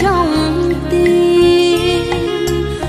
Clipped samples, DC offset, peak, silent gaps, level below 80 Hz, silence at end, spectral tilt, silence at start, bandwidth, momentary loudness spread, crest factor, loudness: under 0.1%; under 0.1%; -2 dBFS; none; -28 dBFS; 0 s; -5.5 dB/octave; 0 s; 14.5 kHz; 7 LU; 10 dB; -13 LUFS